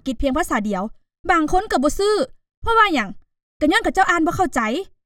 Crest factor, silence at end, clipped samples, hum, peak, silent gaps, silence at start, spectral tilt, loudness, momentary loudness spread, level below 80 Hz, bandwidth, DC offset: 16 dB; 0.2 s; under 0.1%; none; -2 dBFS; 1.19-1.24 s, 2.57-2.62 s, 3.43-3.60 s; 0.05 s; -4 dB/octave; -19 LUFS; 11 LU; -36 dBFS; 17 kHz; under 0.1%